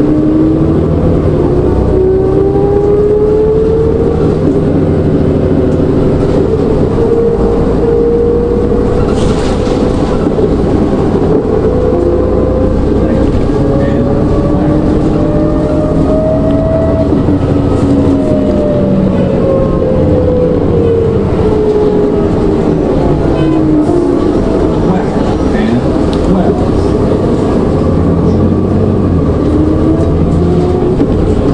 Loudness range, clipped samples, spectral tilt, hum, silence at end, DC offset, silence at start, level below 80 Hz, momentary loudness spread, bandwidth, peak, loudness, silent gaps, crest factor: 1 LU; under 0.1%; -9 dB/octave; none; 0 s; under 0.1%; 0 s; -20 dBFS; 2 LU; 10 kHz; 0 dBFS; -10 LUFS; none; 8 dB